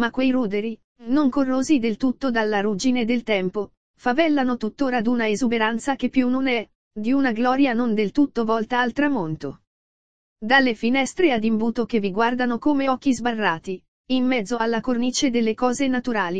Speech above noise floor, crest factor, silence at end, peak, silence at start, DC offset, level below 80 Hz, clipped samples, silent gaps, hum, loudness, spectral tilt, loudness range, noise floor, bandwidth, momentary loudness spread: over 69 dB; 20 dB; 0 s; -2 dBFS; 0 s; 1%; -52 dBFS; under 0.1%; 0.84-0.96 s, 3.77-3.94 s, 6.75-6.91 s, 9.67-10.36 s, 13.88-14.04 s; none; -22 LUFS; -4.5 dB/octave; 1 LU; under -90 dBFS; 9.6 kHz; 7 LU